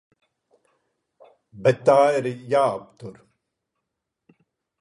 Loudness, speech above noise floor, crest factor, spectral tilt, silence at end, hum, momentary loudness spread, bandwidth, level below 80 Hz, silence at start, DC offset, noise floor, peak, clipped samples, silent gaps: -20 LUFS; 61 dB; 22 dB; -6 dB/octave; 1.7 s; none; 25 LU; 11 kHz; -70 dBFS; 1.55 s; under 0.1%; -82 dBFS; -4 dBFS; under 0.1%; none